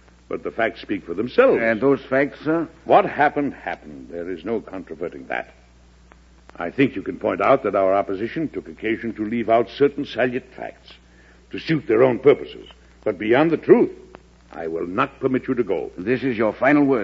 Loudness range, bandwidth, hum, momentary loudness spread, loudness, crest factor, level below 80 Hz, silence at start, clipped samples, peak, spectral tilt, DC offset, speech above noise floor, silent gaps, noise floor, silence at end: 7 LU; 7.4 kHz; none; 16 LU; -21 LUFS; 20 dB; -52 dBFS; 0.3 s; under 0.1%; 0 dBFS; -8 dB/octave; under 0.1%; 30 dB; none; -50 dBFS; 0 s